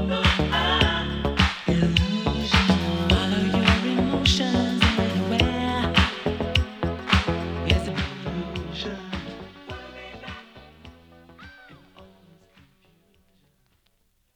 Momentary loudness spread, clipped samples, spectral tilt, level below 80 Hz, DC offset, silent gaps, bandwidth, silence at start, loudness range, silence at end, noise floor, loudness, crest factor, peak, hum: 18 LU; under 0.1%; -5.5 dB/octave; -34 dBFS; under 0.1%; none; 12.5 kHz; 0 s; 18 LU; 2.3 s; -67 dBFS; -23 LUFS; 22 dB; -2 dBFS; none